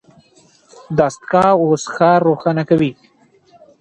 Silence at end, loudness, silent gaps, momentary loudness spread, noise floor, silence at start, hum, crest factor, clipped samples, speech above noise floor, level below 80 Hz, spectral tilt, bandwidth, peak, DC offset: 0.9 s; -15 LUFS; none; 5 LU; -51 dBFS; 0.9 s; none; 16 dB; under 0.1%; 37 dB; -52 dBFS; -6.5 dB/octave; 9.8 kHz; 0 dBFS; under 0.1%